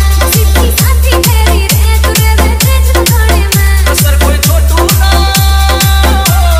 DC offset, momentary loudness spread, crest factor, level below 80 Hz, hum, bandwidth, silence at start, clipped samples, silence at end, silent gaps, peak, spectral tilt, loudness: under 0.1%; 1 LU; 6 dB; -10 dBFS; none; 16.5 kHz; 0 s; 0.3%; 0 s; none; 0 dBFS; -4 dB/octave; -8 LUFS